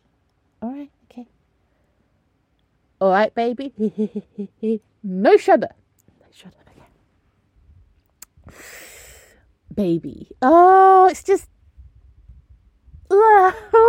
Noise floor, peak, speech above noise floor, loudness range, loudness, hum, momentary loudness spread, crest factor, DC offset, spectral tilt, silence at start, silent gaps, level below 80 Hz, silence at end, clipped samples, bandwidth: -65 dBFS; -2 dBFS; 49 dB; 11 LU; -16 LUFS; none; 24 LU; 18 dB; under 0.1%; -6 dB/octave; 0.6 s; none; -54 dBFS; 0 s; under 0.1%; 16 kHz